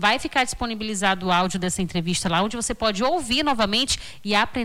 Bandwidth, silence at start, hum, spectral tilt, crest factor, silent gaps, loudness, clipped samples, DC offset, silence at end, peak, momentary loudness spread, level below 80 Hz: 16.5 kHz; 0 s; none; -3.5 dB/octave; 14 dB; none; -22 LUFS; under 0.1%; under 0.1%; 0 s; -8 dBFS; 5 LU; -44 dBFS